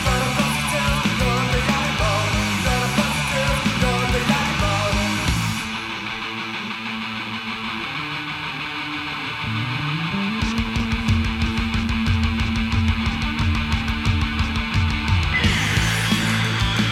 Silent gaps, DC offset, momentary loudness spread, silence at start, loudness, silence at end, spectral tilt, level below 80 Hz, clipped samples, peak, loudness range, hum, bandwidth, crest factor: none; under 0.1%; 7 LU; 0 s; -21 LUFS; 0 s; -4.5 dB/octave; -30 dBFS; under 0.1%; -4 dBFS; 6 LU; none; 16.5 kHz; 16 dB